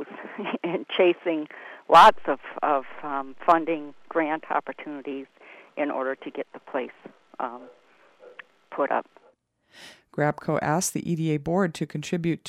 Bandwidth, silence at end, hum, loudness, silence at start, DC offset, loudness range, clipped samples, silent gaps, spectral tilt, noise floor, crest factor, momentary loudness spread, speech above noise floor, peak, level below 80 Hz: 16 kHz; 0 s; none; -25 LUFS; 0 s; under 0.1%; 12 LU; under 0.1%; none; -5 dB/octave; -62 dBFS; 20 dB; 16 LU; 38 dB; -6 dBFS; -62 dBFS